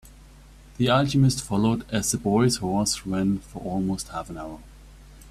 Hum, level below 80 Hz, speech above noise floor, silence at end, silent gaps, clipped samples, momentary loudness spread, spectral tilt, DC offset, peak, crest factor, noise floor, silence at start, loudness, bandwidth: none; -46 dBFS; 24 dB; 0 s; none; under 0.1%; 13 LU; -5 dB/octave; under 0.1%; -8 dBFS; 18 dB; -48 dBFS; 0.05 s; -24 LUFS; 15 kHz